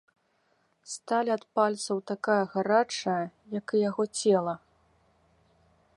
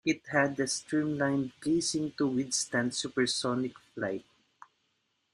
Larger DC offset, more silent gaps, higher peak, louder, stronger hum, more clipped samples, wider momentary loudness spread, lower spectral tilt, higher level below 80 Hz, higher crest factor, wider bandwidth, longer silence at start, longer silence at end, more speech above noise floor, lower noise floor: neither; neither; about the same, -10 dBFS vs -10 dBFS; first, -28 LUFS vs -31 LUFS; neither; neither; first, 10 LU vs 7 LU; about the same, -4.5 dB/octave vs -3.5 dB/octave; second, -76 dBFS vs -70 dBFS; about the same, 20 dB vs 20 dB; second, 11.5 kHz vs 13.5 kHz; first, 0.85 s vs 0.05 s; first, 1.4 s vs 1.15 s; about the same, 43 dB vs 46 dB; second, -71 dBFS vs -77 dBFS